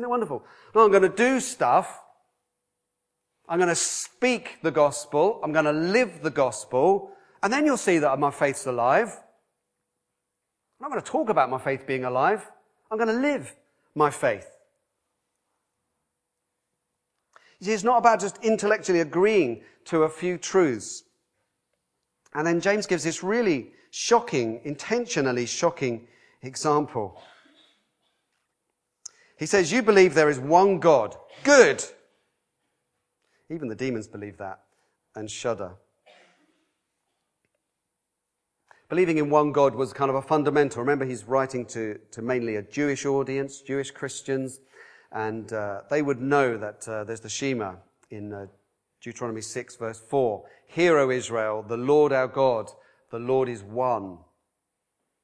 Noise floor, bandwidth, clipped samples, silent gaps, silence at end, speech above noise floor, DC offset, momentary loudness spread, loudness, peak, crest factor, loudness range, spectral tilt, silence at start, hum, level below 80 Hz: -82 dBFS; 11 kHz; under 0.1%; none; 1.05 s; 58 dB; under 0.1%; 17 LU; -24 LUFS; -2 dBFS; 24 dB; 11 LU; -4.5 dB/octave; 0 s; none; -70 dBFS